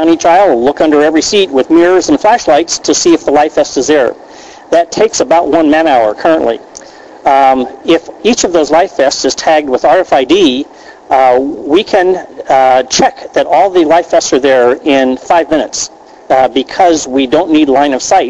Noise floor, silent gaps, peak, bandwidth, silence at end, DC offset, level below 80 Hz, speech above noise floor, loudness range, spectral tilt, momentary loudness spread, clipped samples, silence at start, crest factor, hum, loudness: -32 dBFS; none; 0 dBFS; 9.8 kHz; 0 s; under 0.1%; -44 dBFS; 23 dB; 2 LU; -3 dB/octave; 5 LU; under 0.1%; 0 s; 8 dB; none; -9 LUFS